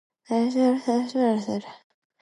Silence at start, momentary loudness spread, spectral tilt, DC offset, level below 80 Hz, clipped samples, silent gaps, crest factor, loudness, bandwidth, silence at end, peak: 0.3 s; 8 LU; -6 dB/octave; under 0.1%; -76 dBFS; under 0.1%; none; 14 dB; -24 LUFS; 11 kHz; 0.45 s; -10 dBFS